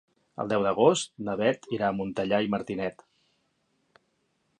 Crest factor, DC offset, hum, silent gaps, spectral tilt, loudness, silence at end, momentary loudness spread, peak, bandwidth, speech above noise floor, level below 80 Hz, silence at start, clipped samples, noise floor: 22 dB; under 0.1%; none; none; -5 dB/octave; -27 LUFS; 1.7 s; 11 LU; -8 dBFS; 10.5 kHz; 47 dB; -64 dBFS; 0.4 s; under 0.1%; -73 dBFS